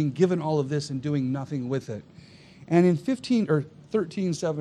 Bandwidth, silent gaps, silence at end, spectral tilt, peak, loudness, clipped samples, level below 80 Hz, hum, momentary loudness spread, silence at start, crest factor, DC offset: 10.5 kHz; none; 0 s; -7 dB/octave; -8 dBFS; -26 LUFS; under 0.1%; -66 dBFS; none; 9 LU; 0 s; 18 dB; under 0.1%